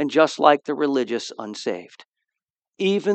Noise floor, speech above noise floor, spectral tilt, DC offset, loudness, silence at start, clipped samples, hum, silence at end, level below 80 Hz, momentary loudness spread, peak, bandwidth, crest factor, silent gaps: -87 dBFS; 66 dB; -5 dB/octave; under 0.1%; -22 LUFS; 0 s; under 0.1%; none; 0 s; -82 dBFS; 13 LU; 0 dBFS; 9 kHz; 22 dB; 2.05-2.11 s